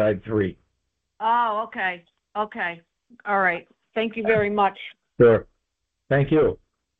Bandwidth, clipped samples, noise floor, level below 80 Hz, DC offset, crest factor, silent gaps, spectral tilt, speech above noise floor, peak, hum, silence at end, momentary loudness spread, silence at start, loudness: 4.4 kHz; under 0.1%; -79 dBFS; -52 dBFS; under 0.1%; 18 dB; none; -9.5 dB/octave; 57 dB; -6 dBFS; none; 0.45 s; 17 LU; 0 s; -23 LUFS